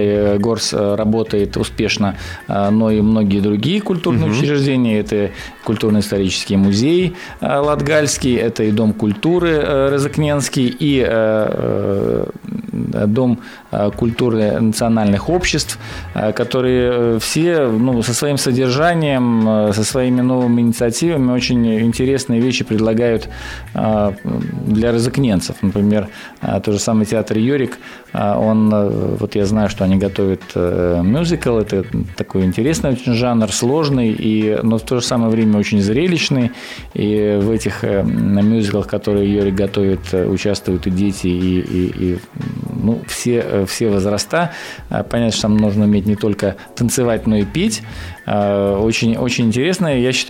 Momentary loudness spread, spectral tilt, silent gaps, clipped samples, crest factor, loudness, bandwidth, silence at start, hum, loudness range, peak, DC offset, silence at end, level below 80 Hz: 7 LU; -5.5 dB/octave; none; under 0.1%; 10 dB; -16 LUFS; 16 kHz; 0 s; none; 3 LU; -6 dBFS; under 0.1%; 0 s; -38 dBFS